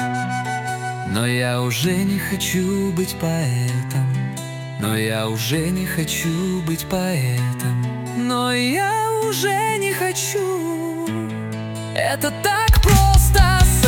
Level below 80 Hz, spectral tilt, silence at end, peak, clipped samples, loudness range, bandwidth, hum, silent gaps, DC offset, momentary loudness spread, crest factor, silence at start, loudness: -26 dBFS; -4.5 dB/octave; 0 s; -2 dBFS; under 0.1%; 3 LU; 18.5 kHz; none; none; under 0.1%; 11 LU; 18 dB; 0 s; -20 LUFS